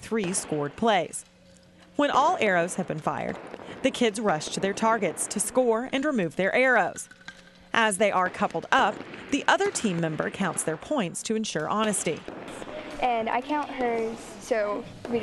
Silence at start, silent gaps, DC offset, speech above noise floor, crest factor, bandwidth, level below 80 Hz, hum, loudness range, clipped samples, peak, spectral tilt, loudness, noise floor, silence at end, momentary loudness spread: 0 s; none; under 0.1%; 28 dB; 22 dB; 12 kHz; -60 dBFS; none; 4 LU; under 0.1%; -4 dBFS; -3.5 dB/octave; -26 LUFS; -54 dBFS; 0 s; 13 LU